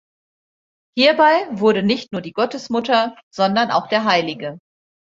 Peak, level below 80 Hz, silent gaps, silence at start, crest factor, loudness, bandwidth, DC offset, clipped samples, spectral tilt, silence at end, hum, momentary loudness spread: -2 dBFS; -64 dBFS; 3.23-3.31 s; 0.95 s; 18 dB; -18 LUFS; 7.8 kHz; under 0.1%; under 0.1%; -5 dB/octave; 0.55 s; none; 12 LU